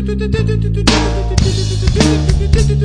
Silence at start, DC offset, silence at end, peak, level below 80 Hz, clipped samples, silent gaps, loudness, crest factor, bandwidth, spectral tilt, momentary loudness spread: 0 s; under 0.1%; 0 s; 0 dBFS; -16 dBFS; under 0.1%; none; -14 LUFS; 12 dB; 10.5 kHz; -5.5 dB/octave; 3 LU